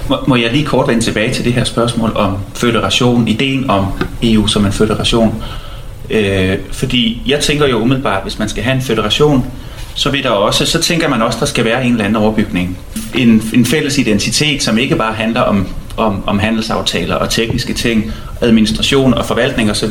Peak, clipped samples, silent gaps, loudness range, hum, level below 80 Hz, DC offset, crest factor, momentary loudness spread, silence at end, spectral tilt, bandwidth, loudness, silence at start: 0 dBFS; under 0.1%; none; 2 LU; none; -28 dBFS; under 0.1%; 12 dB; 6 LU; 0 s; -4.5 dB/octave; 16.5 kHz; -13 LUFS; 0 s